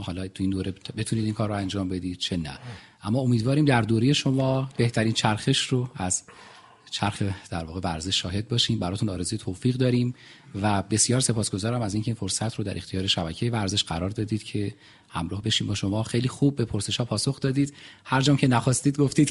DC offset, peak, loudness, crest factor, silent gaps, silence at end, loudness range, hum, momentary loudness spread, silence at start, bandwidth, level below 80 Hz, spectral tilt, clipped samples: under 0.1%; -4 dBFS; -25 LUFS; 22 dB; none; 0 s; 4 LU; none; 10 LU; 0 s; 11.5 kHz; -52 dBFS; -4.5 dB/octave; under 0.1%